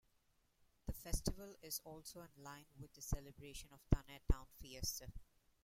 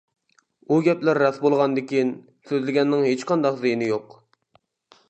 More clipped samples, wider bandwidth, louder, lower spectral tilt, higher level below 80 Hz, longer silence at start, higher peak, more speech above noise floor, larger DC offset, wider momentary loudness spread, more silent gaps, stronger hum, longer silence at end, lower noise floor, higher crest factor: neither; first, 16.5 kHz vs 8.4 kHz; second, -47 LUFS vs -22 LUFS; second, -4.5 dB/octave vs -6.5 dB/octave; first, -48 dBFS vs -74 dBFS; first, 0.85 s vs 0.7 s; second, -16 dBFS vs -6 dBFS; second, 34 dB vs 43 dB; neither; first, 15 LU vs 7 LU; neither; neither; second, 0.4 s vs 1.05 s; first, -79 dBFS vs -64 dBFS; first, 28 dB vs 18 dB